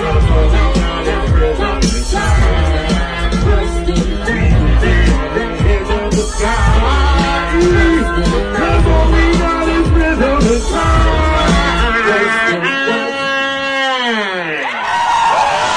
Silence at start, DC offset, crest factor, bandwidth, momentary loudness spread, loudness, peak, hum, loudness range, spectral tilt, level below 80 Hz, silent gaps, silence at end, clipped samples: 0 s; under 0.1%; 10 dB; 10.5 kHz; 5 LU; -13 LUFS; -2 dBFS; none; 2 LU; -5.5 dB/octave; -16 dBFS; none; 0 s; under 0.1%